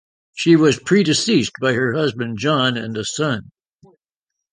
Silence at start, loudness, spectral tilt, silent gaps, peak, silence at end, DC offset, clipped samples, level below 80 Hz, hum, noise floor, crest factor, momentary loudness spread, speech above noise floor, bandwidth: 0.35 s; -18 LUFS; -4.5 dB/octave; none; -2 dBFS; 1.1 s; under 0.1%; under 0.1%; -56 dBFS; none; -83 dBFS; 18 dB; 10 LU; 65 dB; 10 kHz